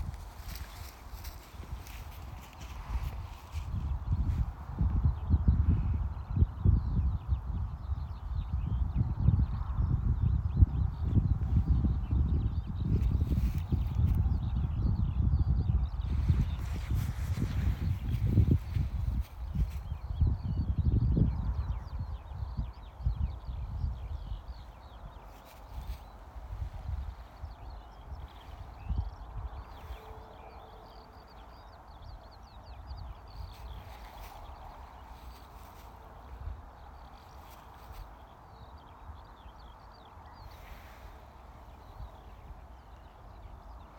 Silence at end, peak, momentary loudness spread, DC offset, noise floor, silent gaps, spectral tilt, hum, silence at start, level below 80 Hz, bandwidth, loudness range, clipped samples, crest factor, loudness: 0 s; -10 dBFS; 22 LU; under 0.1%; -52 dBFS; none; -8.5 dB/octave; none; 0 s; -36 dBFS; 17 kHz; 20 LU; under 0.1%; 24 dB; -33 LUFS